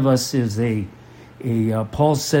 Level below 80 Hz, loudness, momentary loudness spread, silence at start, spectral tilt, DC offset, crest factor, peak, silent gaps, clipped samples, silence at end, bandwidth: -48 dBFS; -21 LUFS; 10 LU; 0 s; -6 dB/octave; under 0.1%; 16 dB; -4 dBFS; none; under 0.1%; 0 s; 16.5 kHz